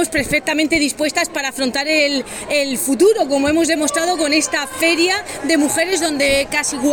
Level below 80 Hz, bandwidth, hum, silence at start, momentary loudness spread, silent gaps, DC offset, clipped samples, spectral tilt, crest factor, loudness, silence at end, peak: -46 dBFS; 19.5 kHz; none; 0 s; 5 LU; none; under 0.1%; under 0.1%; -2 dB/octave; 14 dB; -16 LUFS; 0 s; -2 dBFS